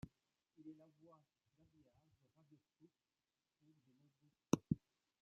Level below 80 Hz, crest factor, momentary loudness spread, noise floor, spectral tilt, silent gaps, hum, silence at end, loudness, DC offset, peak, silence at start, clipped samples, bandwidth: -74 dBFS; 32 dB; 22 LU; under -90 dBFS; -8 dB/octave; none; none; 0.45 s; -43 LUFS; under 0.1%; -20 dBFS; 0.65 s; under 0.1%; 7 kHz